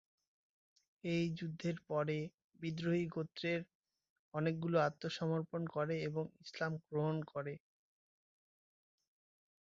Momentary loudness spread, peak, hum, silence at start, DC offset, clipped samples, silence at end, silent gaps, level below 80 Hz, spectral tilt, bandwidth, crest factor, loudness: 11 LU; -20 dBFS; none; 1.05 s; under 0.1%; under 0.1%; 2.15 s; 2.34-2.38 s, 2.44-2.50 s, 3.75-3.81 s, 4.10-4.31 s; -78 dBFS; -6 dB/octave; 7.6 kHz; 20 dB; -40 LUFS